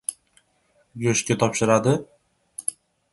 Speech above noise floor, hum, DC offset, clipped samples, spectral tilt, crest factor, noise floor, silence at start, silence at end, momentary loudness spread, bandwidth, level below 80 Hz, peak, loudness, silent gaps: 44 dB; none; under 0.1%; under 0.1%; -4.5 dB/octave; 22 dB; -65 dBFS; 0.1 s; 0.4 s; 14 LU; 12 kHz; -60 dBFS; -2 dBFS; -23 LUFS; none